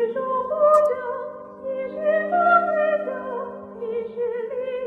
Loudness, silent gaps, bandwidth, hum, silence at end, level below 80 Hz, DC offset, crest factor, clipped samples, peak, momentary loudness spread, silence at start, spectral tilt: -22 LUFS; none; 9 kHz; none; 0 s; -66 dBFS; under 0.1%; 16 dB; under 0.1%; -6 dBFS; 14 LU; 0 s; -6 dB/octave